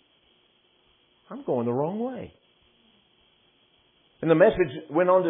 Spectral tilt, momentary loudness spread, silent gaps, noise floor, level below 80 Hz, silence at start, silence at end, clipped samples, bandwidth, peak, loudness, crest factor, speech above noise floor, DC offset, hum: -11 dB/octave; 20 LU; none; -64 dBFS; -58 dBFS; 1.3 s; 0 s; under 0.1%; 3.9 kHz; -6 dBFS; -24 LUFS; 20 dB; 41 dB; under 0.1%; none